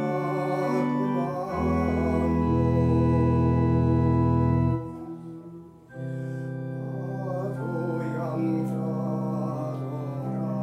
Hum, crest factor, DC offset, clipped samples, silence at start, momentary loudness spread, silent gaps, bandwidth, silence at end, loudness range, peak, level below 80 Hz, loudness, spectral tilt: none; 14 dB; under 0.1%; under 0.1%; 0 s; 13 LU; none; 8.6 kHz; 0 s; 9 LU; -12 dBFS; -40 dBFS; -26 LUFS; -9.5 dB/octave